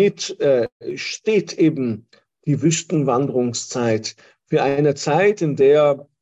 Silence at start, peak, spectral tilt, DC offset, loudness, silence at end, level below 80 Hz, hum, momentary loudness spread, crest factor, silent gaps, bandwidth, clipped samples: 0 s; -4 dBFS; -5.5 dB/octave; under 0.1%; -19 LUFS; 0.2 s; -62 dBFS; none; 10 LU; 14 dB; 0.72-0.80 s; 8.4 kHz; under 0.1%